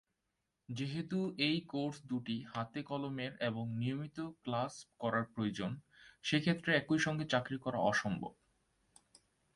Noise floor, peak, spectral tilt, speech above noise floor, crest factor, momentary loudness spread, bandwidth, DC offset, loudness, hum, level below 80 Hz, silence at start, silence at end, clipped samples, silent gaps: -86 dBFS; -16 dBFS; -5.5 dB/octave; 49 dB; 22 dB; 10 LU; 11.5 kHz; under 0.1%; -37 LUFS; none; -72 dBFS; 0.7 s; 1.25 s; under 0.1%; none